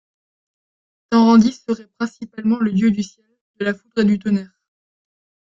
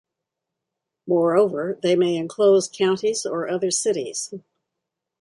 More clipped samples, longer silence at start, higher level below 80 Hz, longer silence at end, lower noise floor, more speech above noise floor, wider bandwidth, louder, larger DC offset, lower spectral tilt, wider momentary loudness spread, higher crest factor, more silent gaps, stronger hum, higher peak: neither; about the same, 1.1 s vs 1.05 s; first, -58 dBFS vs -72 dBFS; first, 1 s vs 0.8 s; first, under -90 dBFS vs -83 dBFS; first, over 73 dB vs 63 dB; second, 7.6 kHz vs 11.5 kHz; first, -18 LUFS vs -21 LUFS; neither; first, -6.5 dB/octave vs -4 dB/octave; first, 14 LU vs 10 LU; about the same, 18 dB vs 16 dB; first, 3.41-3.54 s vs none; neither; first, -2 dBFS vs -6 dBFS